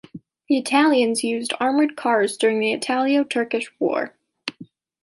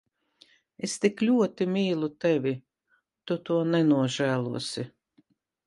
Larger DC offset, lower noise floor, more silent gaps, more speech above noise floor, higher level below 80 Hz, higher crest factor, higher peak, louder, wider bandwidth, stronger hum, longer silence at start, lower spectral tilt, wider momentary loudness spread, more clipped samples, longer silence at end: neither; second, -46 dBFS vs -72 dBFS; neither; second, 25 dB vs 46 dB; about the same, -74 dBFS vs -72 dBFS; about the same, 16 dB vs 18 dB; first, -6 dBFS vs -10 dBFS; first, -21 LUFS vs -27 LUFS; about the same, 11.5 kHz vs 11.5 kHz; neither; second, 0.15 s vs 0.8 s; second, -3.5 dB/octave vs -5.5 dB/octave; about the same, 15 LU vs 13 LU; neither; second, 0.4 s vs 0.8 s